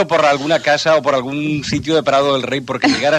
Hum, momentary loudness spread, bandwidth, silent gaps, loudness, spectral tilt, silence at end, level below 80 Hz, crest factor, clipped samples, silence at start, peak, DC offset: none; 6 LU; 12.5 kHz; none; -15 LUFS; -4.5 dB/octave; 0 s; -48 dBFS; 14 dB; under 0.1%; 0 s; 0 dBFS; under 0.1%